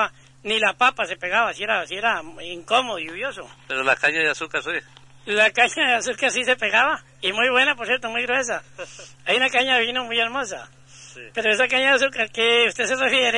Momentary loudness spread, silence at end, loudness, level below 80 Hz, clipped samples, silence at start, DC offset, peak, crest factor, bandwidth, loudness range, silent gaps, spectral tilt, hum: 14 LU; 0 s; -20 LUFS; -60 dBFS; under 0.1%; 0 s; under 0.1%; -4 dBFS; 18 dB; 11 kHz; 3 LU; none; -1.5 dB/octave; none